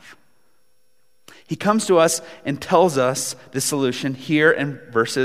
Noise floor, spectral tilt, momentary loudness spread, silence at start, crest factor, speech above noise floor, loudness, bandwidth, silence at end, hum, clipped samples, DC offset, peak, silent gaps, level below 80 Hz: -68 dBFS; -4 dB/octave; 10 LU; 0.1 s; 18 dB; 48 dB; -20 LUFS; 16 kHz; 0 s; none; under 0.1%; 0.2%; -2 dBFS; none; -64 dBFS